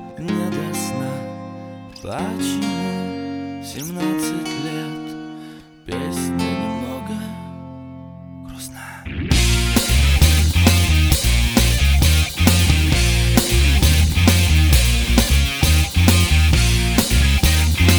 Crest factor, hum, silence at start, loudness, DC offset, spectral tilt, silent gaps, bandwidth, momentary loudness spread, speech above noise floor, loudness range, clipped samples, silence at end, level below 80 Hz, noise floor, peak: 18 dB; none; 0 s; -17 LUFS; under 0.1%; -4.5 dB/octave; none; over 20 kHz; 18 LU; 16 dB; 12 LU; under 0.1%; 0 s; -20 dBFS; -39 dBFS; 0 dBFS